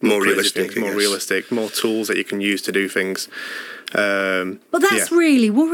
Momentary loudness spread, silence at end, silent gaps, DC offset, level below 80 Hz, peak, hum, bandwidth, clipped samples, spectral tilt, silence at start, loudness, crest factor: 9 LU; 0 s; none; under 0.1%; -80 dBFS; -2 dBFS; none; 19 kHz; under 0.1%; -3 dB/octave; 0 s; -19 LUFS; 18 dB